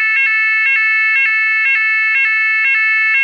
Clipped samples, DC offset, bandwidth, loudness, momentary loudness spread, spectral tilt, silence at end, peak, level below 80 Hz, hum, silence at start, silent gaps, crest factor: under 0.1%; under 0.1%; 6.6 kHz; -11 LUFS; 1 LU; 3 dB/octave; 0 s; -4 dBFS; -68 dBFS; none; 0 s; none; 10 dB